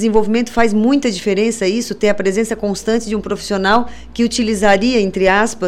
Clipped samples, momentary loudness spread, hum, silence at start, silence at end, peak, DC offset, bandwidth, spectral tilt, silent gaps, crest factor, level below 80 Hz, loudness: under 0.1%; 6 LU; none; 0 s; 0 s; -2 dBFS; 3%; 14.5 kHz; -4.5 dB/octave; none; 12 dB; -38 dBFS; -15 LUFS